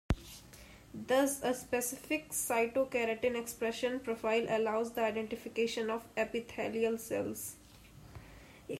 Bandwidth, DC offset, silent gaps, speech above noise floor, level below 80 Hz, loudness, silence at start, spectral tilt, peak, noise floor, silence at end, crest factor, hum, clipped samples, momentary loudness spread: 16 kHz; under 0.1%; none; 22 dB; -54 dBFS; -35 LUFS; 0.1 s; -4 dB/octave; -18 dBFS; -56 dBFS; 0 s; 18 dB; none; under 0.1%; 21 LU